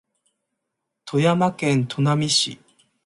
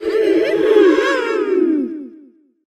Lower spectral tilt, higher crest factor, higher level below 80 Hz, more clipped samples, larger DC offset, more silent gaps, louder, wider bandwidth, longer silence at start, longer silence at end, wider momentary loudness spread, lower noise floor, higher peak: about the same, -4.5 dB/octave vs -4.5 dB/octave; about the same, 18 dB vs 16 dB; second, -64 dBFS vs -58 dBFS; neither; neither; neither; second, -20 LUFS vs -15 LUFS; about the same, 11.5 kHz vs 11 kHz; first, 1.05 s vs 0 s; about the same, 0.5 s vs 0.5 s; second, 5 LU vs 10 LU; first, -80 dBFS vs -47 dBFS; second, -6 dBFS vs 0 dBFS